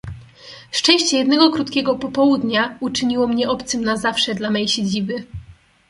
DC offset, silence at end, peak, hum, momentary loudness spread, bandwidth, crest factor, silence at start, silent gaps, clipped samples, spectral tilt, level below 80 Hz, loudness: under 0.1%; 0.35 s; -2 dBFS; none; 12 LU; 11.5 kHz; 18 dB; 0.05 s; none; under 0.1%; -3.5 dB/octave; -48 dBFS; -18 LUFS